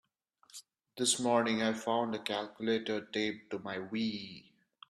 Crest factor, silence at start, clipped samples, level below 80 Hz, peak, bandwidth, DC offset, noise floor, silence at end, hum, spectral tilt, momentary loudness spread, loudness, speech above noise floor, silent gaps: 20 dB; 0.55 s; under 0.1%; -76 dBFS; -14 dBFS; 14 kHz; under 0.1%; -69 dBFS; 0.5 s; none; -3 dB/octave; 22 LU; -34 LUFS; 35 dB; none